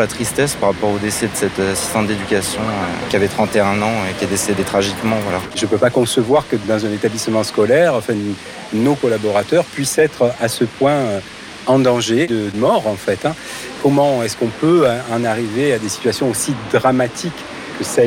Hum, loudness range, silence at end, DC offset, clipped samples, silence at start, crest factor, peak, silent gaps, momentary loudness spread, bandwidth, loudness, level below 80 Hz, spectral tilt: none; 1 LU; 0 s; under 0.1%; under 0.1%; 0 s; 12 dB; -4 dBFS; none; 7 LU; 17 kHz; -17 LUFS; -48 dBFS; -4.5 dB/octave